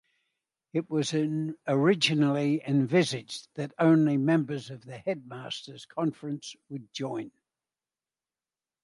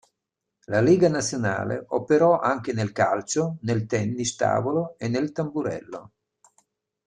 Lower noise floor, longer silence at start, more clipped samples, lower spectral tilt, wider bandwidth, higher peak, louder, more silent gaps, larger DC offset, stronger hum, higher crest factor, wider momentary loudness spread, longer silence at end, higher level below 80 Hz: first, under -90 dBFS vs -84 dBFS; about the same, 0.75 s vs 0.7 s; neither; about the same, -6 dB/octave vs -5.5 dB/octave; about the same, 11.5 kHz vs 11 kHz; second, -10 dBFS vs -6 dBFS; second, -28 LUFS vs -24 LUFS; neither; neither; neither; about the same, 20 dB vs 18 dB; first, 15 LU vs 9 LU; first, 1.55 s vs 1 s; second, -76 dBFS vs -62 dBFS